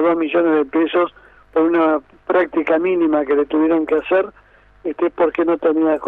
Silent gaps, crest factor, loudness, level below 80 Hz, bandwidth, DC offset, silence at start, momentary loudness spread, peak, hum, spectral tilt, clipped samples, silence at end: none; 12 dB; -17 LUFS; -54 dBFS; 3.9 kHz; under 0.1%; 0 s; 7 LU; -4 dBFS; none; -8 dB/octave; under 0.1%; 0 s